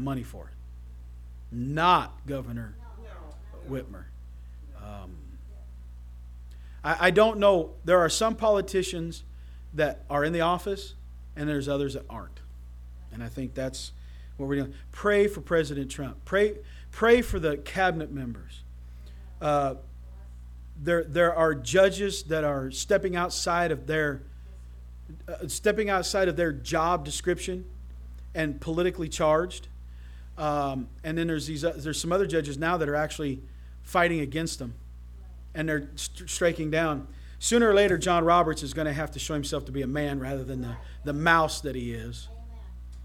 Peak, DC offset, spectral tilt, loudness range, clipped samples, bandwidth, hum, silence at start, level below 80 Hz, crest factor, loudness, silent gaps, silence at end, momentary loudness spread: -6 dBFS; under 0.1%; -4.5 dB/octave; 8 LU; under 0.1%; 17.5 kHz; 60 Hz at -45 dBFS; 0 s; -42 dBFS; 22 dB; -27 LUFS; none; 0 s; 24 LU